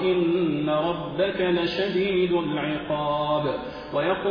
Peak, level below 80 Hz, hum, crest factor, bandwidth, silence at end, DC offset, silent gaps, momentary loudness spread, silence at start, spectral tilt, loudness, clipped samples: -12 dBFS; -52 dBFS; none; 12 dB; 5.2 kHz; 0 s; under 0.1%; none; 5 LU; 0 s; -8 dB/octave; -25 LUFS; under 0.1%